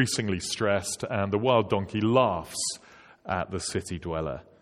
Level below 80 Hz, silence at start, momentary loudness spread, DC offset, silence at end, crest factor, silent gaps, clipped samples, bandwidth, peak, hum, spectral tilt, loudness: -54 dBFS; 0 s; 9 LU; under 0.1%; 0.2 s; 22 dB; none; under 0.1%; 16 kHz; -6 dBFS; none; -4.5 dB/octave; -28 LUFS